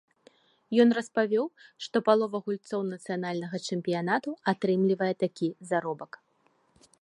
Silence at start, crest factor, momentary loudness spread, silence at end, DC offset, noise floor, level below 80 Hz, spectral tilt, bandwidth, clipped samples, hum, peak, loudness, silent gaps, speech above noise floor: 0.7 s; 22 dB; 10 LU; 0.95 s; under 0.1%; -69 dBFS; -78 dBFS; -6 dB/octave; 11 kHz; under 0.1%; none; -8 dBFS; -28 LUFS; none; 41 dB